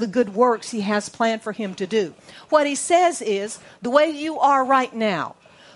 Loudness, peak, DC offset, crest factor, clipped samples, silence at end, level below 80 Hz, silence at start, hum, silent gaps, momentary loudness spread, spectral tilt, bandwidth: -21 LUFS; -2 dBFS; under 0.1%; 20 dB; under 0.1%; 0.45 s; -70 dBFS; 0 s; none; none; 10 LU; -4 dB/octave; 11.5 kHz